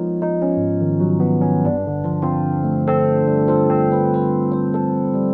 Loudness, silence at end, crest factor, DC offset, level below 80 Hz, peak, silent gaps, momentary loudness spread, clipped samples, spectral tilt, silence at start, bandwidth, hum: -18 LUFS; 0 s; 14 dB; under 0.1%; -50 dBFS; -4 dBFS; none; 4 LU; under 0.1%; -13 dB/octave; 0 s; 3.3 kHz; none